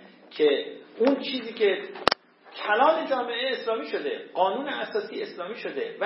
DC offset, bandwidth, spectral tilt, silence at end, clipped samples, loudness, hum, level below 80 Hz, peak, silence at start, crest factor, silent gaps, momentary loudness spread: under 0.1%; 11 kHz; -5 dB/octave; 0 s; under 0.1%; -27 LUFS; none; -66 dBFS; 0 dBFS; 0 s; 26 dB; none; 12 LU